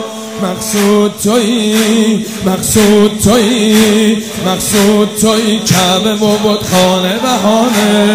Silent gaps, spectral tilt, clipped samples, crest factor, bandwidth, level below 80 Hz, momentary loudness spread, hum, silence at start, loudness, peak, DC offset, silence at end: none; -4 dB/octave; 0.4%; 10 dB; 16.5 kHz; -40 dBFS; 6 LU; none; 0 s; -10 LUFS; 0 dBFS; 0.5%; 0 s